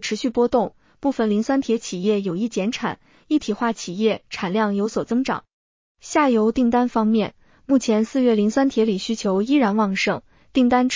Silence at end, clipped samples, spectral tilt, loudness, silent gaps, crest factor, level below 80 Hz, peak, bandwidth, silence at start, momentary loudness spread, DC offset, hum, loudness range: 0 s; under 0.1%; -5.5 dB/octave; -21 LUFS; 5.53-5.95 s; 16 dB; -54 dBFS; -6 dBFS; 7.6 kHz; 0 s; 7 LU; under 0.1%; none; 4 LU